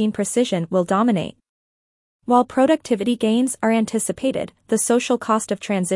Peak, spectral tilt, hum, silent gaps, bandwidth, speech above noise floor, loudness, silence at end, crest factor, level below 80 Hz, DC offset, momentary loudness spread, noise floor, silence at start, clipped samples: -4 dBFS; -4.5 dB/octave; none; 1.49-2.20 s; 12 kHz; over 71 dB; -20 LUFS; 0 s; 16 dB; -60 dBFS; under 0.1%; 6 LU; under -90 dBFS; 0 s; under 0.1%